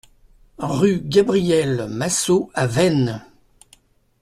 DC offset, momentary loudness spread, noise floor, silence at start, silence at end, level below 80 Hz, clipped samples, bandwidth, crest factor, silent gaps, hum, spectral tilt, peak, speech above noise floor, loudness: under 0.1%; 8 LU; -56 dBFS; 0.6 s; 1 s; -52 dBFS; under 0.1%; 14 kHz; 18 dB; none; none; -5 dB/octave; -2 dBFS; 37 dB; -19 LUFS